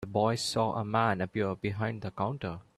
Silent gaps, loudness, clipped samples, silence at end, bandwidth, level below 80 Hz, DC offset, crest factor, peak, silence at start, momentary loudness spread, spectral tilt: none; -31 LUFS; under 0.1%; 0.15 s; 13.5 kHz; -62 dBFS; under 0.1%; 18 dB; -14 dBFS; 0 s; 6 LU; -5.5 dB/octave